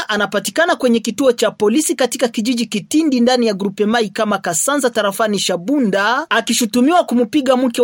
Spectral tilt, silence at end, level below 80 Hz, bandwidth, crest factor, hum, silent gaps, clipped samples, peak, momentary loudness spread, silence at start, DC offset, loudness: -3.5 dB/octave; 0 s; -62 dBFS; 17 kHz; 14 dB; none; none; under 0.1%; 0 dBFS; 4 LU; 0 s; under 0.1%; -16 LUFS